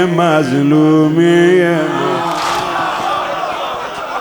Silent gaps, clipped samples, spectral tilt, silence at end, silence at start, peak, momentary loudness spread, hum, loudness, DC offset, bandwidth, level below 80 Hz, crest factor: none; under 0.1%; -6 dB/octave; 0 s; 0 s; 0 dBFS; 10 LU; none; -13 LUFS; under 0.1%; 19 kHz; -52 dBFS; 12 dB